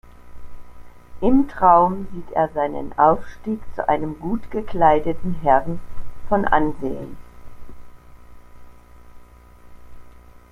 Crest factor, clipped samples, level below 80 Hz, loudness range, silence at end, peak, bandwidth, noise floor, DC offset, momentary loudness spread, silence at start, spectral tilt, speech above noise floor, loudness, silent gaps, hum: 20 dB; under 0.1%; -38 dBFS; 7 LU; 0.35 s; 0 dBFS; 6.2 kHz; -45 dBFS; under 0.1%; 13 LU; 0.05 s; -8.5 dB/octave; 26 dB; -20 LUFS; none; 60 Hz at -50 dBFS